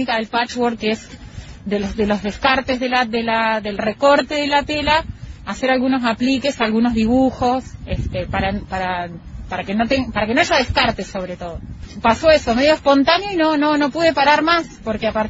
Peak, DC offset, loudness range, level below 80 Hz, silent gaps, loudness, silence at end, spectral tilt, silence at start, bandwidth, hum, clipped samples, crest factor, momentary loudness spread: 0 dBFS; under 0.1%; 5 LU; -38 dBFS; none; -18 LUFS; 0 s; -5 dB/octave; 0 s; 8 kHz; none; under 0.1%; 18 dB; 13 LU